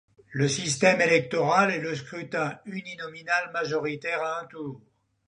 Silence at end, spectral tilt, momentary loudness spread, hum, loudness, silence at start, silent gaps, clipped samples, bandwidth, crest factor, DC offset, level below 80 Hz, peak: 0.5 s; -4 dB/octave; 16 LU; none; -26 LUFS; 0.3 s; none; under 0.1%; 11 kHz; 22 dB; under 0.1%; -70 dBFS; -6 dBFS